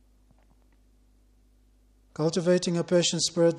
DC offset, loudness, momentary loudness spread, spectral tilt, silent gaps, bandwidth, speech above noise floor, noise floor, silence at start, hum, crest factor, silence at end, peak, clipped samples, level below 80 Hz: under 0.1%; -25 LUFS; 6 LU; -4.5 dB/octave; none; 11.5 kHz; 37 dB; -61 dBFS; 2.2 s; 50 Hz at -60 dBFS; 16 dB; 0 s; -12 dBFS; under 0.1%; -62 dBFS